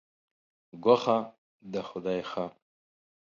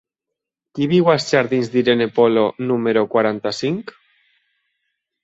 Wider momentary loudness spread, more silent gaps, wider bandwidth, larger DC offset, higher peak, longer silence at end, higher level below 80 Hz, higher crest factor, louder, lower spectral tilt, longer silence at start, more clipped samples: first, 14 LU vs 9 LU; first, 1.38-1.59 s vs none; second, 7.2 kHz vs 8 kHz; neither; second, -8 dBFS vs -2 dBFS; second, 0.75 s vs 1.35 s; second, -72 dBFS vs -62 dBFS; first, 24 dB vs 18 dB; second, -29 LUFS vs -18 LUFS; about the same, -6.5 dB/octave vs -6 dB/octave; about the same, 0.75 s vs 0.75 s; neither